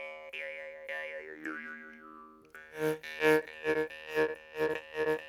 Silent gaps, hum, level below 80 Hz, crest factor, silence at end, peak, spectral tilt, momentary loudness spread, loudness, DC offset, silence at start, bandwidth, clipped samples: none; none; -70 dBFS; 22 dB; 0 s; -12 dBFS; -4.5 dB/octave; 21 LU; -34 LUFS; under 0.1%; 0 s; 17 kHz; under 0.1%